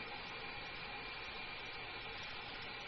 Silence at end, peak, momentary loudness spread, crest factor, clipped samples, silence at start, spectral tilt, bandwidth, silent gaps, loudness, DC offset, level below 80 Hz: 0 s; -34 dBFS; 0 LU; 14 dB; under 0.1%; 0 s; -0.5 dB/octave; 6.2 kHz; none; -46 LUFS; under 0.1%; -62 dBFS